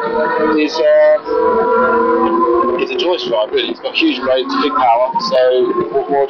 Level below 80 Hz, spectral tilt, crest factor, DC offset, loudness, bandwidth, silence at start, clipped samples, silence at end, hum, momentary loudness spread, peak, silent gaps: -50 dBFS; -5 dB/octave; 12 dB; under 0.1%; -14 LUFS; 6.8 kHz; 0 s; under 0.1%; 0 s; none; 4 LU; -2 dBFS; none